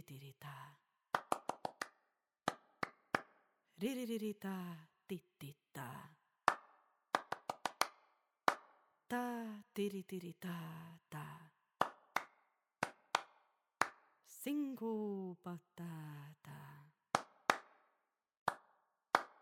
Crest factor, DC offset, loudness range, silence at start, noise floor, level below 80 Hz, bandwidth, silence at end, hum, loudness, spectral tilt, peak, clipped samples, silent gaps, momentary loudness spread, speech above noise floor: 34 dB; under 0.1%; 4 LU; 0.1 s; -85 dBFS; -88 dBFS; 17 kHz; 0.1 s; none; -43 LUFS; -4 dB/octave; -12 dBFS; under 0.1%; 18.37-18.46 s; 17 LU; 40 dB